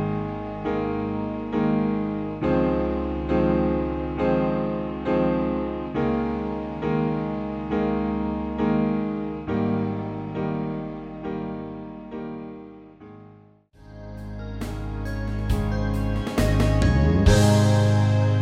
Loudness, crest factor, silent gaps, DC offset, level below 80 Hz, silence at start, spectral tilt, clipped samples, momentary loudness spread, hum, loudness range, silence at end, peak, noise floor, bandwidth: -24 LUFS; 18 dB; none; under 0.1%; -34 dBFS; 0 s; -7.5 dB/octave; under 0.1%; 15 LU; none; 13 LU; 0 s; -6 dBFS; -52 dBFS; 15 kHz